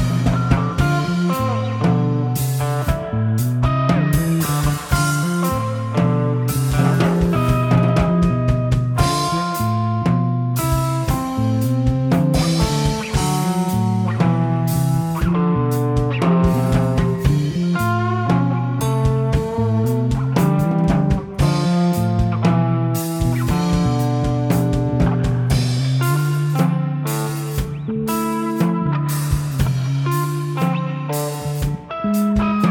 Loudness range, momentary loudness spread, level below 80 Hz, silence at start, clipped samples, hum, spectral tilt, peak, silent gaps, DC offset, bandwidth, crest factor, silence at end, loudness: 3 LU; 4 LU; -30 dBFS; 0 s; under 0.1%; none; -6.5 dB/octave; -2 dBFS; none; under 0.1%; 18.5 kHz; 16 dB; 0 s; -19 LUFS